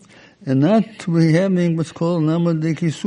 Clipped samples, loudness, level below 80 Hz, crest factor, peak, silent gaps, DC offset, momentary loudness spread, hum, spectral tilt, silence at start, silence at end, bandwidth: under 0.1%; -18 LUFS; -60 dBFS; 14 dB; -4 dBFS; none; under 0.1%; 6 LU; none; -8 dB/octave; 0.45 s; 0 s; 10.5 kHz